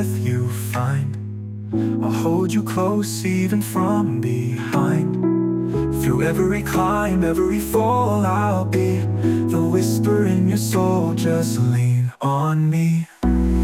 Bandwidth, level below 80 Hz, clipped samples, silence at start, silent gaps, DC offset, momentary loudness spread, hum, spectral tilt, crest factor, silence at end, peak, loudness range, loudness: 16.5 kHz; -34 dBFS; under 0.1%; 0 s; none; under 0.1%; 4 LU; none; -7 dB/octave; 12 dB; 0 s; -6 dBFS; 2 LU; -20 LUFS